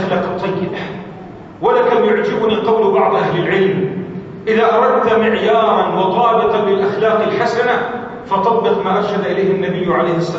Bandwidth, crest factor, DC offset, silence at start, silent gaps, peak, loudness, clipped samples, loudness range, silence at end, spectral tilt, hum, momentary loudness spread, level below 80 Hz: 7.8 kHz; 14 dB; under 0.1%; 0 s; none; -2 dBFS; -15 LUFS; under 0.1%; 2 LU; 0 s; -7 dB/octave; none; 10 LU; -52 dBFS